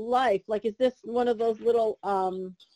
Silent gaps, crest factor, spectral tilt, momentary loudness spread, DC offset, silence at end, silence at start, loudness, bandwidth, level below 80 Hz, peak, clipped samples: none; 14 dB; -6 dB/octave; 5 LU; under 0.1%; 0.2 s; 0 s; -27 LUFS; 11.5 kHz; -66 dBFS; -12 dBFS; under 0.1%